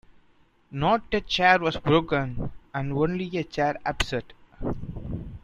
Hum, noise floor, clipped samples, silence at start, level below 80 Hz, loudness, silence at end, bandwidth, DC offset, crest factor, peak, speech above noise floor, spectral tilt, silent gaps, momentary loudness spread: none; -60 dBFS; under 0.1%; 0.7 s; -42 dBFS; -26 LUFS; 0.05 s; 13 kHz; under 0.1%; 22 dB; -6 dBFS; 35 dB; -5.5 dB/octave; none; 15 LU